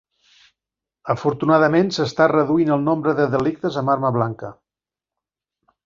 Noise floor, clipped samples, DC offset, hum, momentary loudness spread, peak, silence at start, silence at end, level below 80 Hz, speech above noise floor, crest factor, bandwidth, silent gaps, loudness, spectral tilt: -89 dBFS; under 0.1%; under 0.1%; none; 10 LU; -2 dBFS; 1.05 s; 1.3 s; -58 dBFS; 71 dB; 18 dB; 7.6 kHz; none; -19 LUFS; -7 dB/octave